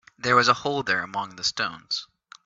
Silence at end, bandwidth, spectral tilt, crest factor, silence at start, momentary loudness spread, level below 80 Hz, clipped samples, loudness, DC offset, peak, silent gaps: 0.4 s; 8 kHz; -3 dB/octave; 22 dB; 0.25 s; 11 LU; -64 dBFS; under 0.1%; -24 LUFS; under 0.1%; -4 dBFS; none